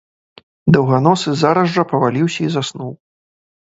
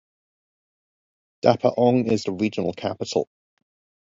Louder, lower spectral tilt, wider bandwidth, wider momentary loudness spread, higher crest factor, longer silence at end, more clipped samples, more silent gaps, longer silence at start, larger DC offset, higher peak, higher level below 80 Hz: first, -16 LUFS vs -23 LUFS; about the same, -6.5 dB/octave vs -6.5 dB/octave; about the same, 8 kHz vs 7.8 kHz; about the same, 10 LU vs 8 LU; second, 16 dB vs 22 dB; about the same, 0.8 s vs 0.8 s; neither; neither; second, 0.65 s vs 1.45 s; neither; about the same, 0 dBFS vs -2 dBFS; first, -52 dBFS vs -60 dBFS